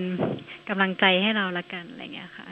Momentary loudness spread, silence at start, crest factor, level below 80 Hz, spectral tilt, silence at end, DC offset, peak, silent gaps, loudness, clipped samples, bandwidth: 18 LU; 0 s; 22 dB; -70 dBFS; -7 dB/octave; 0 s; under 0.1%; -4 dBFS; none; -24 LUFS; under 0.1%; 5.2 kHz